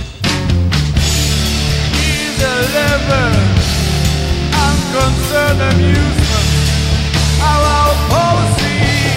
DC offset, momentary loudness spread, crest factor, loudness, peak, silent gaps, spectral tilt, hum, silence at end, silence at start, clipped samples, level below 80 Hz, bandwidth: under 0.1%; 3 LU; 12 dB; -13 LUFS; 0 dBFS; none; -4.5 dB/octave; none; 0 s; 0 s; under 0.1%; -18 dBFS; 16.5 kHz